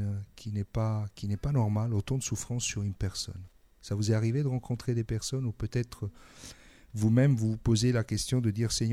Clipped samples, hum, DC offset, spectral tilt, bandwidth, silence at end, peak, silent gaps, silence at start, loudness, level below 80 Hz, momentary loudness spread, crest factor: under 0.1%; none; under 0.1%; -5.5 dB/octave; 13.5 kHz; 0 s; -12 dBFS; none; 0 s; -30 LUFS; -48 dBFS; 14 LU; 18 dB